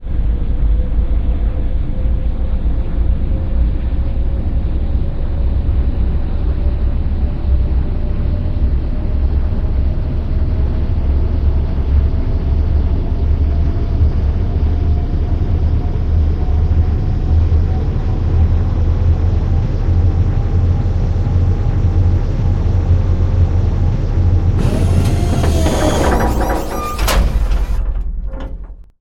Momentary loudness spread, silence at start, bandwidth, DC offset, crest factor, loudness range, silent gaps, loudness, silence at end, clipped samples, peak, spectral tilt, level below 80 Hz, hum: 5 LU; 0 s; 14.5 kHz; under 0.1%; 14 dB; 4 LU; none; -17 LUFS; 0.2 s; under 0.1%; 0 dBFS; -7.5 dB/octave; -16 dBFS; none